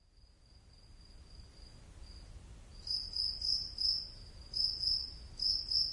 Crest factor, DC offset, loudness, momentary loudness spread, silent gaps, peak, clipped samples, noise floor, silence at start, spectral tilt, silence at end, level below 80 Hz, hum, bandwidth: 20 dB; under 0.1%; -34 LUFS; 24 LU; none; -20 dBFS; under 0.1%; -63 dBFS; 0.15 s; -1.5 dB/octave; 0 s; -54 dBFS; none; 11.5 kHz